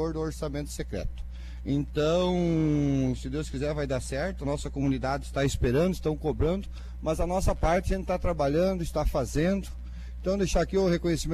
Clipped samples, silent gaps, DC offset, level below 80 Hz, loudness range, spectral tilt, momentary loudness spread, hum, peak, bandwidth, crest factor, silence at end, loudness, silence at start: under 0.1%; none; under 0.1%; -36 dBFS; 1 LU; -6.5 dB/octave; 9 LU; none; -12 dBFS; 14 kHz; 16 dB; 0 s; -28 LUFS; 0 s